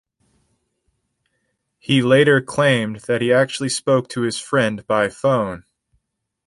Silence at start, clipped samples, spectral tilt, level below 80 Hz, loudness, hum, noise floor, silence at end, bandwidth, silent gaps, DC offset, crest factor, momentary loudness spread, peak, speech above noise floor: 1.9 s; under 0.1%; -5 dB/octave; -58 dBFS; -18 LUFS; none; -74 dBFS; 0.85 s; 11.5 kHz; none; under 0.1%; 18 dB; 10 LU; -2 dBFS; 56 dB